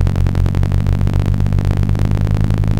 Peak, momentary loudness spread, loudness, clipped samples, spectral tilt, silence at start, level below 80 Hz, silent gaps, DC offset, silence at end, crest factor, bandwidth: -4 dBFS; 0 LU; -16 LUFS; under 0.1%; -8.5 dB/octave; 0 s; -18 dBFS; none; under 0.1%; 0 s; 10 dB; 8.8 kHz